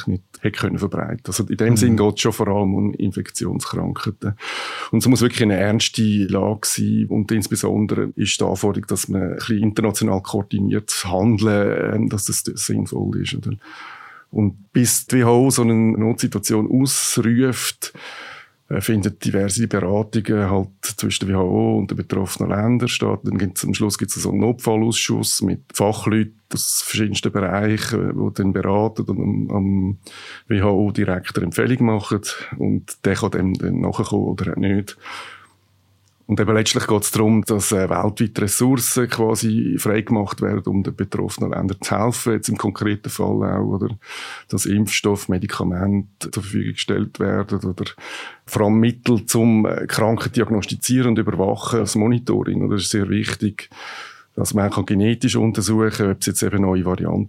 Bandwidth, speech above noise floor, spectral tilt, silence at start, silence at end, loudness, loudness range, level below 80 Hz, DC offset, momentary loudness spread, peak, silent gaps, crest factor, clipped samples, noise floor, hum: 16.5 kHz; 39 dB; -5 dB/octave; 0 s; 0 s; -20 LUFS; 4 LU; -52 dBFS; under 0.1%; 9 LU; -2 dBFS; none; 18 dB; under 0.1%; -59 dBFS; none